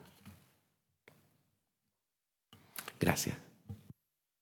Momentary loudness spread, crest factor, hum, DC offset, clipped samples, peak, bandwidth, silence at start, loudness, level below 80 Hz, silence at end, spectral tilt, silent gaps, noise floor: 26 LU; 32 dB; none; under 0.1%; under 0.1%; -10 dBFS; 19 kHz; 0 s; -37 LUFS; -70 dBFS; 0.6 s; -4 dB/octave; none; -89 dBFS